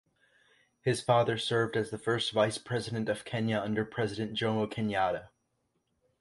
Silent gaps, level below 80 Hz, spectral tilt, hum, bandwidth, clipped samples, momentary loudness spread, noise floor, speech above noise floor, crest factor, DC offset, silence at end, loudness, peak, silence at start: none; -64 dBFS; -5.5 dB/octave; none; 11.5 kHz; under 0.1%; 7 LU; -78 dBFS; 48 dB; 20 dB; under 0.1%; 0.95 s; -31 LUFS; -12 dBFS; 0.85 s